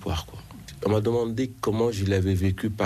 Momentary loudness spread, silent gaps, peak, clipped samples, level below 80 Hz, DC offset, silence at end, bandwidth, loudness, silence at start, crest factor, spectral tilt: 14 LU; none; -12 dBFS; under 0.1%; -48 dBFS; under 0.1%; 0 s; 13.5 kHz; -26 LUFS; 0 s; 14 dB; -7 dB/octave